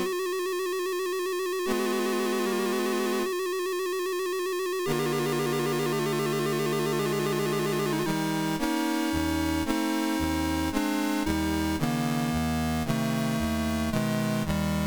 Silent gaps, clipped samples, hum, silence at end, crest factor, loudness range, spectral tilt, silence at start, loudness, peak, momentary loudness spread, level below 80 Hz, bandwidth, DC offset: none; under 0.1%; none; 0 s; 12 dB; 1 LU; -5 dB/octave; 0 s; -28 LUFS; -14 dBFS; 2 LU; -44 dBFS; over 20 kHz; 0.2%